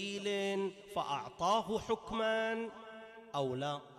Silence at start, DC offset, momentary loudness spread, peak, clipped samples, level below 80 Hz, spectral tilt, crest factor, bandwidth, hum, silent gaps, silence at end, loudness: 0 s; under 0.1%; 11 LU; -22 dBFS; under 0.1%; -66 dBFS; -4.5 dB/octave; 16 dB; 14 kHz; none; none; 0 s; -37 LUFS